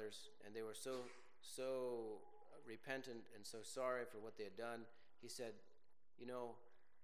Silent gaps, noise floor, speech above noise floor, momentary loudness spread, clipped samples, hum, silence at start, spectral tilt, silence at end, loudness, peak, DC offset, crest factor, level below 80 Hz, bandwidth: none; -77 dBFS; 26 dB; 15 LU; under 0.1%; none; 0 s; -3.5 dB/octave; 0.3 s; -51 LUFS; -30 dBFS; 0.1%; 22 dB; under -90 dBFS; 16 kHz